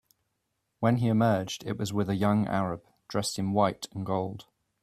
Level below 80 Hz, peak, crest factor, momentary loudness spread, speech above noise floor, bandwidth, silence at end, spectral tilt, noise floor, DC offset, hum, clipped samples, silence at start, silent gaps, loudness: -62 dBFS; -10 dBFS; 20 dB; 10 LU; 52 dB; 14.5 kHz; 0.4 s; -6 dB/octave; -80 dBFS; under 0.1%; none; under 0.1%; 0.8 s; none; -29 LUFS